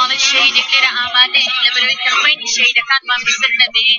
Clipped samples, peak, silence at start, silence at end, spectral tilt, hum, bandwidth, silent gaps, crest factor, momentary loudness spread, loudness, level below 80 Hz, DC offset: under 0.1%; 0 dBFS; 0 s; 0 s; 2.5 dB/octave; none; 7.4 kHz; none; 14 dB; 3 LU; -11 LUFS; -58 dBFS; under 0.1%